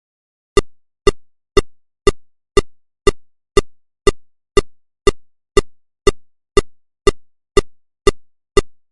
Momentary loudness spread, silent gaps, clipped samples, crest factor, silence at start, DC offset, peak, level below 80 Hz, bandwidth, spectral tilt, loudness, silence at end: 0 LU; none; under 0.1%; 18 dB; 0.55 s; 0.1%; 0 dBFS; -26 dBFS; 11.5 kHz; -4.5 dB/octave; -19 LUFS; 0.2 s